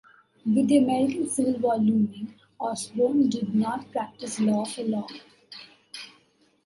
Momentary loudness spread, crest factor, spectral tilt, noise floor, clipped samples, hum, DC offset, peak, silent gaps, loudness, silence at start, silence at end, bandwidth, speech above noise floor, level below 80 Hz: 21 LU; 16 dB; -5.5 dB/octave; -63 dBFS; under 0.1%; none; under 0.1%; -10 dBFS; none; -25 LUFS; 0.45 s; 0.6 s; 11.5 kHz; 39 dB; -68 dBFS